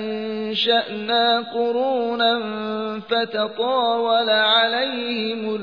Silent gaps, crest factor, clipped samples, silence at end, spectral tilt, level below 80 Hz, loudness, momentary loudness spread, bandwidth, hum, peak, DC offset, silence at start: none; 14 dB; under 0.1%; 0 s; -5.5 dB/octave; -74 dBFS; -20 LUFS; 9 LU; 5.4 kHz; none; -6 dBFS; 0.1%; 0 s